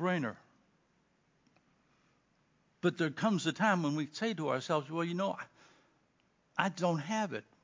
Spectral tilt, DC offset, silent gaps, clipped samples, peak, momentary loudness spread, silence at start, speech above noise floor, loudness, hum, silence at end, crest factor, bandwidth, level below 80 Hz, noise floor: -5.5 dB/octave; under 0.1%; none; under 0.1%; -14 dBFS; 8 LU; 0 s; 40 dB; -34 LUFS; none; 0.25 s; 22 dB; 7.6 kHz; -84 dBFS; -73 dBFS